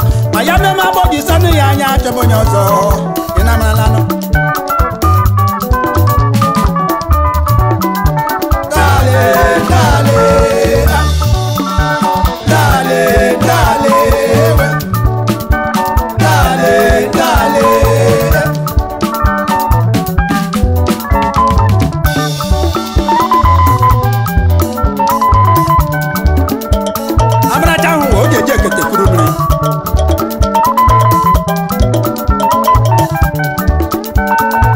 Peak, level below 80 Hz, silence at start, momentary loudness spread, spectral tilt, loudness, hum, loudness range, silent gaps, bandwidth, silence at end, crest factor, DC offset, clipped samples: 0 dBFS; -18 dBFS; 0 s; 5 LU; -6 dB/octave; -11 LUFS; none; 2 LU; none; 16.5 kHz; 0 s; 10 dB; 0.3%; under 0.1%